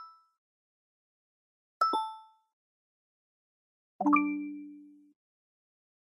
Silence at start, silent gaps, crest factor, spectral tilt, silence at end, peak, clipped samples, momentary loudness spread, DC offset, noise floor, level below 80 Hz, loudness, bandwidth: 0 s; 0.38-1.80 s, 2.53-3.99 s; 26 dB; -5.5 dB/octave; 1.2 s; -12 dBFS; under 0.1%; 21 LU; under 0.1%; -52 dBFS; under -90 dBFS; -31 LUFS; 11 kHz